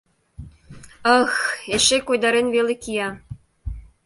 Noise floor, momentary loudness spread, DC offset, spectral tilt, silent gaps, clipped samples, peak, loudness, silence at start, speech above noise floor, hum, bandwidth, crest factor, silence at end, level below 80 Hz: -44 dBFS; 19 LU; under 0.1%; -2.5 dB/octave; none; under 0.1%; -2 dBFS; -19 LUFS; 0.4 s; 24 dB; none; 11.5 kHz; 20 dB; 0.25 s; -42 dBFS